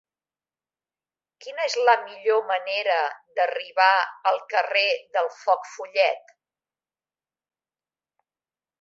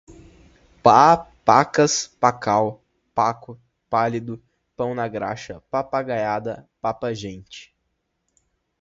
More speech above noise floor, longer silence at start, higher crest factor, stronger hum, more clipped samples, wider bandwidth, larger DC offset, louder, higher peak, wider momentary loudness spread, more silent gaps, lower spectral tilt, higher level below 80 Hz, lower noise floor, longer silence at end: first, over 67 dB vs 54 dB; first, 1.4 s vs 0.1 s; about the same, 22 dB vs 22 dB; neither; neither; about the same, 7.8 kHz vs 8 kHz; neither; about the same, -23 LUFS vs -21 LUFS; second, -4 dBFS vs 0 dBFS; second, 9 LU vs 18 LU; neither; second, 1 dB/octave vs -4.5 dB/octave; second, -86 dBFS vs -56 dBFS; first, under -90 dBFS vs -74 dBFS; first, 2.6 s vs 1.2 s